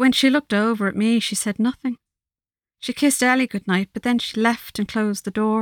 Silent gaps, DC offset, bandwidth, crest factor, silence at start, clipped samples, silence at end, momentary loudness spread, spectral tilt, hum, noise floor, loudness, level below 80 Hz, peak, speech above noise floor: none; under 0.1%; 18.5 kHz; 16 dB; 0 s; under 0.1%; 0 s; 9 LU; -4 dB/octave; none; under -90 dBFS; -21 LUFS; -60 dBFS; -4 dBFS; over 70 dB